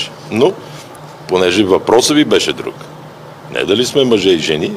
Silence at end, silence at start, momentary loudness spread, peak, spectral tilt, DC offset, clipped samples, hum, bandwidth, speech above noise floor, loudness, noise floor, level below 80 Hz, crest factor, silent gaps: 0 s; 0 s; 22 LU; 0 dBFS; -4 dB/octave; under 0.1%; under 0.1%; none; 15.5 kHz; 21 dB; -13 LUFS; -33 dBFS; -52 dBFS; 14 dB; none